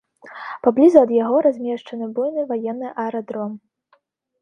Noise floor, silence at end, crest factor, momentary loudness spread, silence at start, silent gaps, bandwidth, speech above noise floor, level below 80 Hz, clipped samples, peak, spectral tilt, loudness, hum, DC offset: -63 dBFS; 0.85 s; 20 dB; 17 LU; 0.25 s; none; 8.8 kHz; 44 dB; -68 dBFS; under 0.1%; 0 dBFS; -7.5 dB/octave; -19 LUFS; none; under 0.1%